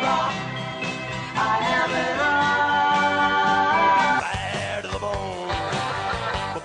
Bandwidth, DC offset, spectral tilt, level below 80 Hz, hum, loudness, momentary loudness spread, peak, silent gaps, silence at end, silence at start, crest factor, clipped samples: 10.5 kHz; under 0.1%; -4 dB/octave; -46 dBFS; none; -22 LUFS; 10 LU; -10 dBFS; none; 0 s; 0 s; 14 dB; under 0.1%